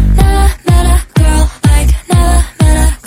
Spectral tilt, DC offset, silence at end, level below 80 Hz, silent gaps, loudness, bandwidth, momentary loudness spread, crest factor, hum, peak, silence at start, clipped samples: -5.5 dB/octave; under 0.1%; 0.1 s; -10 dBFS; none; -10 LUFS; 16 kHz; 2 LU; 8 dB; none; 0 dBFS; 0 s; 0.7%